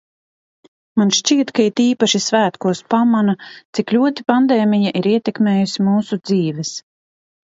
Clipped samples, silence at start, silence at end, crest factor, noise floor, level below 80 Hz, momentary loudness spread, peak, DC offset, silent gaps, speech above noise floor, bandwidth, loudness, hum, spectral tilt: under 0.1%; 0.95 s; 0.65 s; 16 dB; under -90 dBFS; -64 dBFS; 8 LU; 0 dBFS; under 0.1%; 3.65-3.73 s; over 74 dB; 7.8 kHz; -17 LUFS; none; -4.5 dB/octave